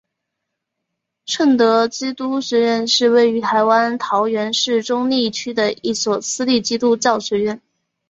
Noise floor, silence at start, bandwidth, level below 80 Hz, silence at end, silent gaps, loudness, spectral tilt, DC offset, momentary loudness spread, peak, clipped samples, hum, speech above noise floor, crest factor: -78 dBFS; 1.25 s; 8 kHz; -62 dBFS; 0.5 s; none; -17 LUFS; -3 dB/octave; under 0.1%; 7 LU; -2 dBFS; under 0.1%; none; 61 dB; 16 dB